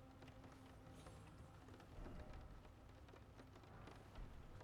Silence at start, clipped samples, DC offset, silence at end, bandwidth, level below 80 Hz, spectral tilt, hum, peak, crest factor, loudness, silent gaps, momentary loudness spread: 0 s; under 0.1%; under 0.1%; 0 s; 15.5 kHz; -64 dBFS; -6 dB/octave; none; -42 dBFS; 16 dB; -61 LUFS; none; 5 LU